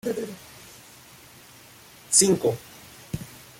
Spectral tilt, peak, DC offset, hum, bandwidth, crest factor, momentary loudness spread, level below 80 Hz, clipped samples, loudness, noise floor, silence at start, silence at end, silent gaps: -3 dB/octave; -4 dBFS; under 0.1%; none; 16.5 kHz; 26 dB; 27 LU; -58 dBFS; under 0.1%; -21 LUFS; -49 dBFS; 0.05 s; 0.2 s; none